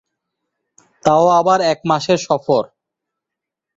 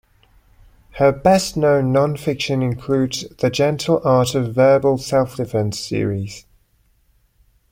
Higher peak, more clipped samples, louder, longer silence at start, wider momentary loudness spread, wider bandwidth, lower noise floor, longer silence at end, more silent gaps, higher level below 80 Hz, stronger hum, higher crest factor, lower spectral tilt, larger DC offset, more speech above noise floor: about the same, -2 dBFS vs -2 dBFS; neither; first, -15 LUFS vs -18 LUFS; about the same, 1.05 s vs 0.95 s; about the same, 7 LU vs 8 LU; second, 7.8 kHz vs 16.5 kHz; first, -83 dBFS vs -60 dBFS; second, 1.1 s vs 1.3 s; neither; second, -58 dBFS vs -48 dBFS; neither; about the same, 16 dB vs 18 dB; about the same, -5 dB/octave vs -6 dB/octave; neither; first, 69 dB vs 42 dB